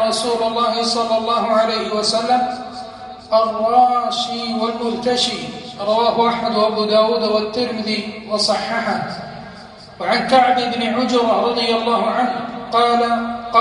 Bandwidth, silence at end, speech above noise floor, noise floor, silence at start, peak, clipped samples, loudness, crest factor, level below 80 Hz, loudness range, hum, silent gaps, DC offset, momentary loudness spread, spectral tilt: 11.5 kHz; 0 s; 20 dB; -38 dBFS; 0 s; -2 dBFS; under 0.1%; -17 LUFS; 16 dB; -54 dBFS; 2 LU; none; none; under 0.1%; 11 LU; -3.5 dB/octave